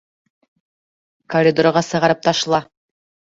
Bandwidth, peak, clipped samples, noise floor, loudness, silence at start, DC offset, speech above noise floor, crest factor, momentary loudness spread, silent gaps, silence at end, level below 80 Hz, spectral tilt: 7.8 kHz; -2 dBFS; under 0.1%; under -90 dBFS; -17 LUFS; 1.3 s; under 0.1%; over 74 dB; 18 dB; 6 LU; none; 0.7 s; -58 dBFS; -4.5 dB/octave